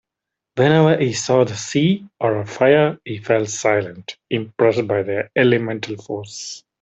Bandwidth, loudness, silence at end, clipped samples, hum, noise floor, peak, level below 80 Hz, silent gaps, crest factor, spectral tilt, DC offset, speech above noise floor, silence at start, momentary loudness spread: 8.2 kHz; -18 LUFS; 0.25 s; under 0.1%; none; -83 dBFS; -2 dBFS; -60 dBFS; none; 16 dB; -5.5 dB/octave; under 0.1%; 65 dB; 0.55 s; 15 LU